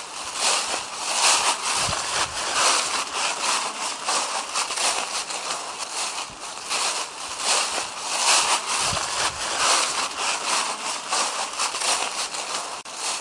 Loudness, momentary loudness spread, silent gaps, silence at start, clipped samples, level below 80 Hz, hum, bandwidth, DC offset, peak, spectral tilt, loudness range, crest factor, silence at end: -22 LUFS; 9 LU; none; 0 s; under 0.1%; -58 dBFS; none; 11.5 kHz; under 0.1%; -6 dBFS; 1 dB/octave; 4 LU; 20 dB; 0 s